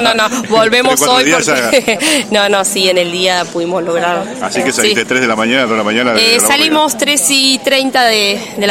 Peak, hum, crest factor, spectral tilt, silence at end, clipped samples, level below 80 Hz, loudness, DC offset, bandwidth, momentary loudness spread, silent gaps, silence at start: 0 dBFS; none; 12 dB; -2 dB/octave; 0 s; under 0.1%; -52 dBFS; -10 LUFS; under 0.1%; 17 kHz; 6 LU; none; 0 s